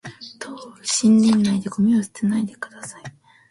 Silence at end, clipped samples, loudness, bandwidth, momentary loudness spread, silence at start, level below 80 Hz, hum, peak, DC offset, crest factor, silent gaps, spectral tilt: 0.4 s; under 0.1%; -19 LUFS; 11.5 kHz; 20 LU; 0.05 s; -60 dBFS; none; -8 dBFS; under 0.1%; 14 dB; none; -4.5 dB/octave